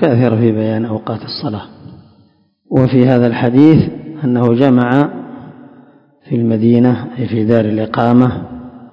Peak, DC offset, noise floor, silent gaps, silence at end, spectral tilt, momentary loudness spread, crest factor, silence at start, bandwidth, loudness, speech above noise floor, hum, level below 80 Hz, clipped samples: 0 dBFS; under 0.1%; -52 dBFS; none; 0.05 s; -10 dB/octave; 13 LU; 14 dB; 0 s; 5.4 kHz; -13 LUFS; 41 dB; none; -44 dBFS; 0.7%